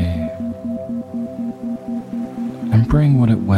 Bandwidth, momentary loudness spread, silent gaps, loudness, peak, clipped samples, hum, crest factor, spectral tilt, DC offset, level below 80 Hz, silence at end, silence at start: 9.6 kHz; 12 LU; none; -20 LUFS; -2 dBFS; under 0.1%; none; 16 dB; -9.5 dB/octave; under 0.1%; -34 dBFS; 0 s; 0 s